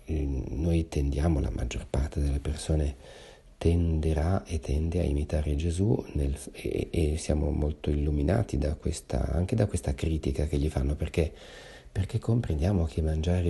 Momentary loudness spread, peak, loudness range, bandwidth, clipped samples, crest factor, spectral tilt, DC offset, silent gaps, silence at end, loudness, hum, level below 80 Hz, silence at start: 6 LU; -10 dBFS; 1 LU; 12 kHz; under 0.1%; 18 dB; -7 dB/octave; under 0.1%; none; 0 s; -29 LUFS; none; -32 dBFS; 0 s